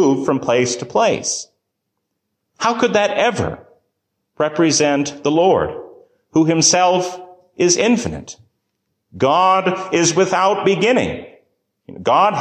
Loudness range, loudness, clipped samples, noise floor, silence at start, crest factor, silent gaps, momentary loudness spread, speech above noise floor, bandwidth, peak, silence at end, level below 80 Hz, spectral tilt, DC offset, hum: 3 LU; -16 LUFS; under 0.1%; -75 dBFS; 0 s; 16 dB; none; 12 LU; 59 dB; 10 kHz; -2 dBFS; 0 s; -48 dBFS; -3.5 dB/octave; under 0.1%; none